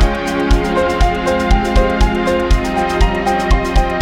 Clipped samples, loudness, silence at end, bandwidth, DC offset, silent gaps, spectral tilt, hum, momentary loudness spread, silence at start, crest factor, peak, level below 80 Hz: under 0.1%; -15 LUFS; 0 s; 13 kHz; under 0.1%; none; -6 dB/octave; none; 2 LU; 0 s; 12 dB; 0 dBFS; -16 dBFS